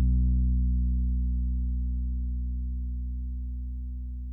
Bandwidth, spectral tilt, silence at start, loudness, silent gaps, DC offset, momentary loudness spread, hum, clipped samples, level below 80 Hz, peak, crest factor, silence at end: 0.5 kHz; -14 dB/octave; 0 s; -31 LUFS; none; under 0.1%; 10 LU; 60 Hz at -70 dBFS; under 0.1%; -28 dBFS; -16 dBFS; 10 dB; 0 s